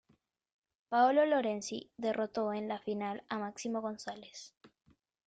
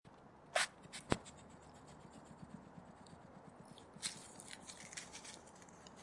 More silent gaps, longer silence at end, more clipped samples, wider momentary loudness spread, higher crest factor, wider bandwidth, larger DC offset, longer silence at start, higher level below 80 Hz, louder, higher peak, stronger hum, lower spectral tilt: first, 4.57-4.61 s vs none; first, 0.6 s vs 0 s; neither; about the same, 17 LU vs 18 LU; second, 18 dB vs 36 dB; second, 9.2 kHz vs 11.5 kHz; neither; first, 0.9 s vs 0.05 s; second, -80 dBFS vs -70 dBFS; first, -34 LUFS vs -45 LUFS; second, -16 dBFS vs -12 dBFS; neither; first, -4.5 dB/octave vs -2.5 dB/octave